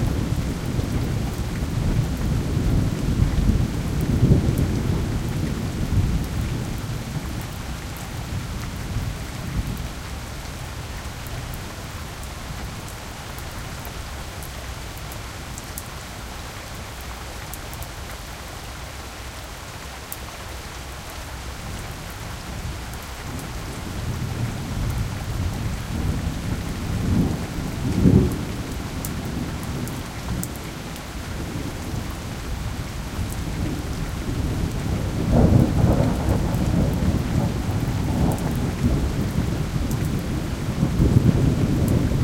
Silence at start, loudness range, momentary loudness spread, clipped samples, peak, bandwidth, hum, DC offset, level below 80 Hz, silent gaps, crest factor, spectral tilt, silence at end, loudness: 0 s; 12 LU; 14 LU; under 0.1%; -2 dBFS; 17 kHz; none; under 0.1%; -30 dBFS; none; 22 dB; -6 dB/octave; 0 s; -26 LUFS